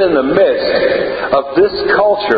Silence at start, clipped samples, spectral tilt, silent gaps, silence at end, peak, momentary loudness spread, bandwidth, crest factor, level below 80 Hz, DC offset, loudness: 0 s; under 0.1%; -7.5 dB/octave; none; 0 s; 0 dBFS; 3 LU; 5 kHz; 12 dB; -44 dBFS; under 0.1%; -13 LUFS